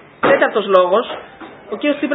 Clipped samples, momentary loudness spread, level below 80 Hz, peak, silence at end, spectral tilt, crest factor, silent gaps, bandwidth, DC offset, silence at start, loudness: under 0.1%; 17 LU; -60 dBFS; 0 dBFS; 0 s; -7.5 dB/octave; 16 dB; none; 4 kHz; under 0.1%; 0.2 s; -15 LUFS